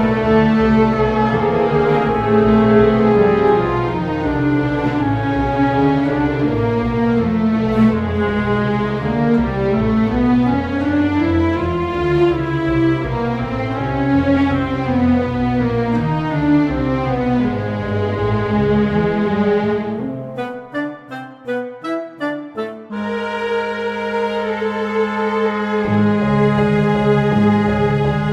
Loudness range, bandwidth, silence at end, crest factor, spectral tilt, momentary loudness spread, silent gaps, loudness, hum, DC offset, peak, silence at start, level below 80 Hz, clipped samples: 7 LU; 7.6 kHz; 0 s; 14 dB; -8.5 dB/octave; 10 LU; none; -17 LUFS; none; under 0.1%; -2 dBFS; 0 s; -34 dBFS; under 0.1%